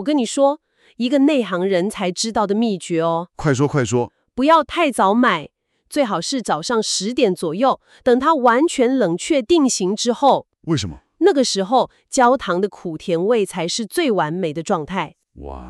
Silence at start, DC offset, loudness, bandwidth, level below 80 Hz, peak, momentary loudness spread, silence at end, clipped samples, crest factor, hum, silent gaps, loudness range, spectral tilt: 0 s; under 0.1%; -18 LUFS; 13 kHz; -50 dBFS; -4 dBFS; 8 LU; 0 s; under 0.1%; 14 dB; none; none; 2 LU; -4.5 dB/octave